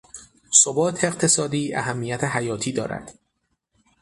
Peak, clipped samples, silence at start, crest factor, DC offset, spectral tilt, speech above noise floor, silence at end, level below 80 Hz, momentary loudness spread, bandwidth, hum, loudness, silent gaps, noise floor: 0 dBFS; under 0.1%; 0.15 s; 24 dB; under 0.1%; -3 dB/octave; 50 dB; 0.9 s; -58 dBFS; 12 LU; 11.5 kHz; none; -21 LUFS; none; -74 dBFS